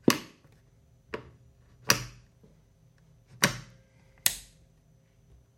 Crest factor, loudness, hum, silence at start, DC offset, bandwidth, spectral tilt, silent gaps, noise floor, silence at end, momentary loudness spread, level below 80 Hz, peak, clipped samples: 34 dB; -30 LUFS; none; 0.1 s; under 0.1%; 16.5 kHz; -2.5 dB/octave; none; -62 dBFS; 1.15 s; 18 LU; -60 dBFS; -2 dBFS; under 0.1%